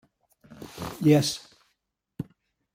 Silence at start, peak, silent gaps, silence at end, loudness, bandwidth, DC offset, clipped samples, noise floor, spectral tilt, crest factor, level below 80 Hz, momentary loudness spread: 0.6 s; -8 dBFS; none; 0.5 s; -25 LUFS; 16.5 kHz; under 0.1%; under 0.1%; -78 dBFS; -5.5 dB/octave; 20 dB; -60 dBFS; 22 LU